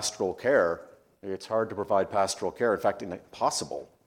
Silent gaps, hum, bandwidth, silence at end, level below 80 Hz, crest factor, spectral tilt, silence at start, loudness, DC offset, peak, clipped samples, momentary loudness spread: none; none; 16.5 kHz; 0.2 s; -68 dBFS; 18 dB; -3.5 dB/octave; 0 s; -28 LUFS; under 0.1%; -10 dBFS; under 0.1%; 13 LU